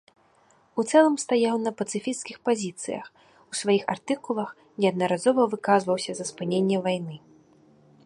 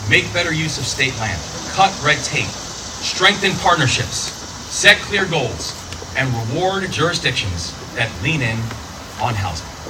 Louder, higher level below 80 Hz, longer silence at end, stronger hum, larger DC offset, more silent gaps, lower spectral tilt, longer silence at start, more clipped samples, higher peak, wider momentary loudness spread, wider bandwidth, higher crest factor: second, -25 LUFS vs -18 LUFS; second, -74 dBFS vs -40 dBFS; first, 0.85 s vs 0 s; neither; neither; neither; first, -5 dB/octave vs -3 dB/octave; first, 0.75 s vs 0 s; neither; second, -6 dBFS vs 0 dBFS; about the same, 12 LU vs 12 LU; second, 11.5 kHz vs 19 kHz; about the same, 20 dB vs 20 dB